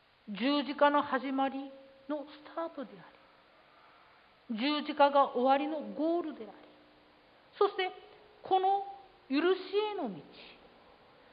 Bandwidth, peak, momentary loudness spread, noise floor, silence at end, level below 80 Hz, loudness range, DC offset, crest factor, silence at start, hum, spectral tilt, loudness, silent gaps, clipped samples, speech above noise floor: 5.2 kHz; -14 dBFS; 21 LU; -62 dBFS; 0.8 s; -80 dBFS; 8 LU; under 0.1%; 20 dB; 0.25 s; none; -8 dB/octave; -32 LUFS; none; under 0.1%; 31 dB